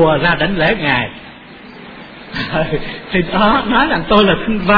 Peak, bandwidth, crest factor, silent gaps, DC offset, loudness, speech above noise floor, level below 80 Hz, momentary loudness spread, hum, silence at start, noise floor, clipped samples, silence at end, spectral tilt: 0 dBFS; 5.4 kHz; 14 dB; none; under 0.1%; -14 LUFS; 22 dB; -32 dBFS; 22 LU; none; 0 s; -36 dBFS; under 0.1%; 0 s; -8 dB/octave